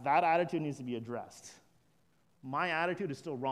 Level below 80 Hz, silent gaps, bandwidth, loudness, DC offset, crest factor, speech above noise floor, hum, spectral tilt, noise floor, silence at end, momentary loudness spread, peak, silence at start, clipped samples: -80 dBFS; none; 13.5 kHz; -34 LUFS; under 0.1%; 20 dB; 39 dB; none; -5.5 dB/octave; -73 dBFS; 0 s; 22 LU; -16 dBFS; 0 s; under 0.1%